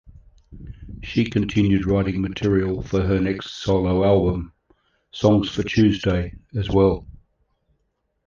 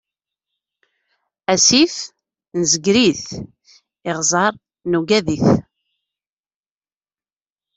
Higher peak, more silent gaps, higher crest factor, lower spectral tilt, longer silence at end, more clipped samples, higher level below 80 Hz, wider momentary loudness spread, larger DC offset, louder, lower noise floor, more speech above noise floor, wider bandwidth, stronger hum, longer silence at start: second, -4 dBFS vs 0 dBFS; neither; about the same, 18 dB vs 20 dB; first, -7.5 dB/octave vs -3 dB/octave; second, 1.1 s vs 2.15 s; neither; first, -38 dBFS vs -54 dBFS; second, 12 LU vs 19 LU; neither; second, -21 LUFS vs -16 LUFS; second, -72 dBFS vs under -90 dBFS; second, 52 dB vs over 74 dB; second, 7.2 kHz vs 8.4 kHz; neither; second, 0.5 s vs 1.5 s